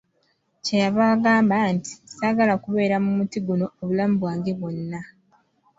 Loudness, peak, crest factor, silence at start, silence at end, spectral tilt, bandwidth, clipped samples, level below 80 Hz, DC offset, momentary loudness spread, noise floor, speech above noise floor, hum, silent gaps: -22 LUFS; -6 dBFS; 16 dB; 0.65 s; 0.75 s; -6.5 dB/octave; 7.8 kHz; under 0.1%; -62 dBFS; under 0.1%; 12 LU; -68 dBFS; 47 dB; none; none